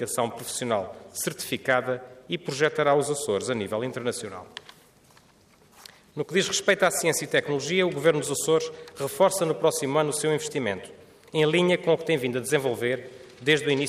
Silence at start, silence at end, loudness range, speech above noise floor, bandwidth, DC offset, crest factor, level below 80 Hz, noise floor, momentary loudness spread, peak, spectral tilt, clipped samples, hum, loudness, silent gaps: 0 s; 0 s; 5 LU; 32 dB; 15.5 kHz; under 0.1%; 18 dB; -70 dBFS; -58 dBFS; 12 LU; -8 dBFS; -3.5 dB/octave; under 0.1%; none; -25 LUFS; none